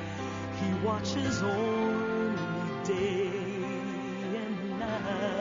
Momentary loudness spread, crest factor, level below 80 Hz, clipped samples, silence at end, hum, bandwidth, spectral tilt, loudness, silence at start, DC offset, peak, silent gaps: 6 LU; 14 dB; -60 dBFS; under 0.1%; 0 s; none; 7.4 kHz; -5 dB/octave; -32 LUFS; 0 s; under 0.1%; -18 dBFS; none